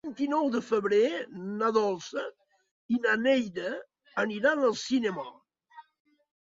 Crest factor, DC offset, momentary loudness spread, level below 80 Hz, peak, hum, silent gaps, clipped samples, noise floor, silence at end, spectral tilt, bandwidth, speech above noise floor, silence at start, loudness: 18 dB; under 0.1%; 12 LU; -74 dBFS; -12 dBFS; none; 2.71-2.89 s; under 0.1%; -55 dBFS; 0.7 s; -4.5 dB/octave; 7.8 kHz; 27 dB; 0.05 s; -28 LUFS